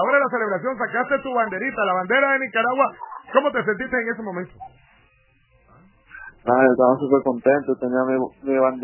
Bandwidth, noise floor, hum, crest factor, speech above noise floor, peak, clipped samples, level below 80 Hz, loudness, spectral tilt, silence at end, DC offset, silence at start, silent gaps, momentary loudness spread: 3.1 kHz; -59 dBFS; none; 20 dB; 39 dB; -2 dBFS; under 0.1%; -60 dBFS; -21 LUFS; -9.5 dB/octave; 0 s; under 0.1%; 0 s; none; 11 LU